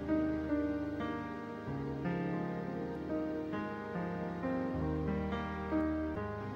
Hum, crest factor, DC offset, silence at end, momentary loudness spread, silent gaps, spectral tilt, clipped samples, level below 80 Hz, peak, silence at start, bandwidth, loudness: none; 14 dB; under 0.1%; 0 s; 5 LU; none; -9 dB/octave; under 0.1%; -52 dBFS; -24 dBFS; 0 s; 7 kHz; -37 LUFS